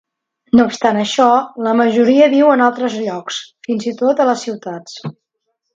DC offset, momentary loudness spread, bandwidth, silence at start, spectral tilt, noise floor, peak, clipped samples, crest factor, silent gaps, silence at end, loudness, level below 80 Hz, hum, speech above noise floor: under 0.1%; 16 LU; 7.8 kHz; 0.55 s; -5 dB/octave; -72 dBFS; 0 dBFS; under 0.1%; 14 dB; none; 0.65 s; -14 LUFS; -56 dBFS; none; 58 dB